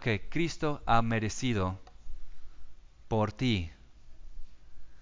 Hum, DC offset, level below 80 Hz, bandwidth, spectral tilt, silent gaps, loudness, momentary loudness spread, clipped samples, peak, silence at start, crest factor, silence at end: none; under 0.1%; -46 dBFS; 7.6 kHz; -5.5 dB/octave; none; -31 LUFS; 18 LU; under 0.1%; -10 dBFS; 0 s; 22 dB; 0 s